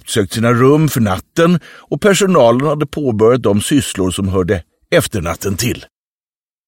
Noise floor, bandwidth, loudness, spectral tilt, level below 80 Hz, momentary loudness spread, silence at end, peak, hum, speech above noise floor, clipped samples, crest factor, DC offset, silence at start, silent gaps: under -90 dBFS; 17 kHz; -14 LUFS; -5.5 dB/octave; -40 dBFS; 9 LU; 0.85 s; 0 dBFS; none; over 77 dB; under 0.1%; 14 dB; under 0.1%; 0.05 s; none